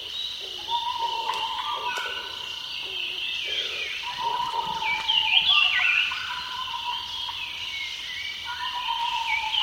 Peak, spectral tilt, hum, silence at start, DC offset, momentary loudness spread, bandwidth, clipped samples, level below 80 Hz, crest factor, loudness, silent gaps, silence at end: -6 dBFS; 0.5 dB/octave; none; 0 s; under 0.1%; 12 LU; 17 kHz; under 0.1%; -60 dBFS; 22 dB; -25 LUFS; none; 0 s